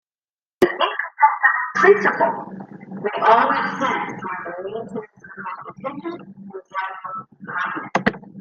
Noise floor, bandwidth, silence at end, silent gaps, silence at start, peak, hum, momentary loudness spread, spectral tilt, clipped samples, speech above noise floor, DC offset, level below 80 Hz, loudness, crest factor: under -90 dBFS; 13.5 kHz; 0 s; none; 0.6 s; 0 dBFS; none; 19 LU; -5 dB/octave; under 0.1%; over 70 dB; under 0.1%; -62 dBFS; -20 LUFS; 20 dB